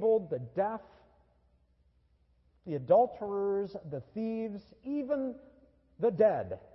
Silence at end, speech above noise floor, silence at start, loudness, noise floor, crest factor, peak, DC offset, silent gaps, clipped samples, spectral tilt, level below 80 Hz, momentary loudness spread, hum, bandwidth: 0.15 s; 37 dB; 0 s; -32 LUFS; -69 dBFS; 20 dB; -14 dBFS; under 0.1%; none; under 0.1%; -10.5 dB/octave; -68 dBFS; 15 LU; none; 5.8 kHz